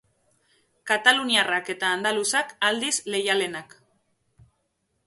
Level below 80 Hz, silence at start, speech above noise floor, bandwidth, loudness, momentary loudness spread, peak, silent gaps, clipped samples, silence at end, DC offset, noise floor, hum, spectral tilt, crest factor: -72 dBFS; 0.85 s; 50 dB; 12 kHz; -23 LUFS; 7 LU; -2 dBFS; none; under 0.1%; 1.4 s; under 0.1%; -74 dBFS; none; -1 dB/octave; 24 dB